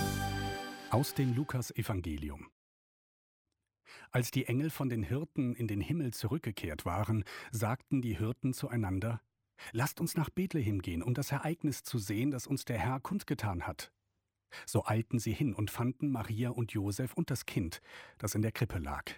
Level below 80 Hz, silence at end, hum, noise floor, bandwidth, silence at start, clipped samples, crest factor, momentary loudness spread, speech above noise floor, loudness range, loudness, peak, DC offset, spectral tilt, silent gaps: -54 dBFS; 0 s; none; -84 dBFS; 17.5 kHz; 0 s; under 0.1%; 18 dB; 8 LU; 50 dB; 2 LU; -36 LUFS; -16 dBFS; under 0.1%; -6 dB/octave; 2.52-3.45 s